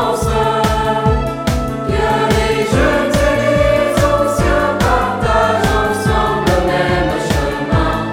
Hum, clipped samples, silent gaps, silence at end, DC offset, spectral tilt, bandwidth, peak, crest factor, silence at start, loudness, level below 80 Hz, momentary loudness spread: none; under 0.1%; none; 0 s; under 0.1%; -5.5 dB/octave; 17 kHz; 0 dBFS; 14 dB; 0 s; -14 LUFS; -24 dBFS; 4 LU